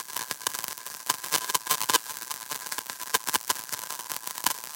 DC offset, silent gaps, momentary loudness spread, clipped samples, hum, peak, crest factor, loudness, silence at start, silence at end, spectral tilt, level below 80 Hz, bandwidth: under 0.1%; none; 8 LU; under 0.1%; none; -4 dBFS; 28 dB; -29 LUFS; 0 s; 0 s; 1 dB/octave; -76 dBFS; 17.5 kHz